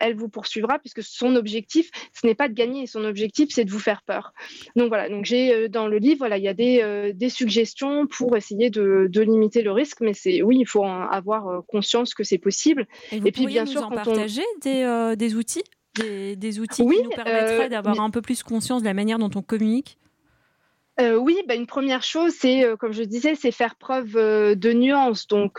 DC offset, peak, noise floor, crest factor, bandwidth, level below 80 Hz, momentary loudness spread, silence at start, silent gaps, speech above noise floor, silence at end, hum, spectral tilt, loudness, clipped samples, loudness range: under 0.1%; -10 dBFS; -67 dBFS; 12 dB; 15 kHz; -68 dBFS; 9 LU; 0 s; none; 46 dB; 0 s; none; -4.5 dB/octave; -22 LUFS; under 0.1%; 4 LU